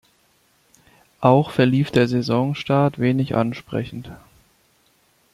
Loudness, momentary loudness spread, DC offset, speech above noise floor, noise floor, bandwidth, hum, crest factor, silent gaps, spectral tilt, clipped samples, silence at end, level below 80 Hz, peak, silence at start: -20 LUFS; 11 LU; under 0.1%; 42 dB; -61 dBFS; 13 kHz; none; 20 dB; none; -8 dB/octave; under 0.1%; 1.2 s; -54 dBFS; -2 dBFS; 1.2 s